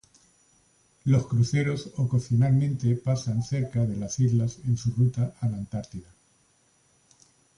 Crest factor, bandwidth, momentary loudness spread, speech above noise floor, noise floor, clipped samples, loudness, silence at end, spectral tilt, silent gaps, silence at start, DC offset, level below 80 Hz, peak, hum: 16 dB; 10.5 kHz; 10 LU; 40 dB; -65 dBFS; under 0.1%; -26 LUFS; 1.55 s; -7 dB/octave; none; 1.05 s; under 0.1%; -54 dBFS; -12 dBFS; none